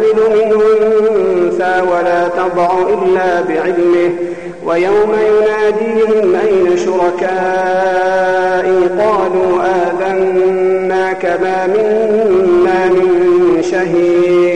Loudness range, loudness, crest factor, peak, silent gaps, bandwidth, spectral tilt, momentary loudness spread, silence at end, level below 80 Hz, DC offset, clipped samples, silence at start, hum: 1 LU; -12 LUFS; 6 dB; -6 dBFS; none; 9.2 kHz; -6 dB/octave; 4 LU; 0 s; -46 dBFS; 1%; under 0.1%; 0 s; none